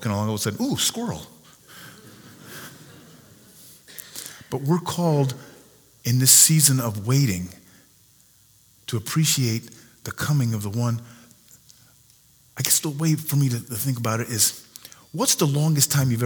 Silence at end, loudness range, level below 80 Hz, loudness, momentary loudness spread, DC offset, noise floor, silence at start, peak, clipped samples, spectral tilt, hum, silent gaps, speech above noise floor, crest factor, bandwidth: 0 s; 12 LU; -60 dBFS; -21 LUFS; 21 LU; under 0.1%; -56 dBFS; 0 s; 0 dBFS; under 0.1%; -3.5 dB/octave; none; none; 35 dB; 24 dB; over 20 kHz